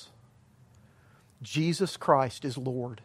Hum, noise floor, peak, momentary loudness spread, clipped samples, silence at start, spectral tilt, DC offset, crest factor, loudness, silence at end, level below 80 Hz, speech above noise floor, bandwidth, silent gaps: none; -60 dBFS; -8 dBFS; 9 LU; under 0.1%; 0 s; -5.5 dB/octave; under 0.1%; 24 dB; -29 LUFS; 0 s; -70 dBFS; 31 dB; 14.5 kHz; none